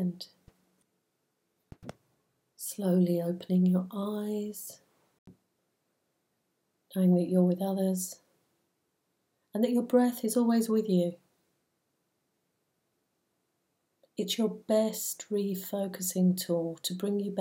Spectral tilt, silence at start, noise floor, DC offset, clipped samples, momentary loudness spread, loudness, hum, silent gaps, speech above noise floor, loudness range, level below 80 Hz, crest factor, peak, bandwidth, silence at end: -6 dB/octave; 0 s; -79 dBFS; under 0.1%; under 0.1%; 15 LU; -30 LUFS; none; 5.18-5.26 s; 51 dB; 6 LU; -78 dBFS; 18 dB; -14 dBFS; 17 kHz; 0 s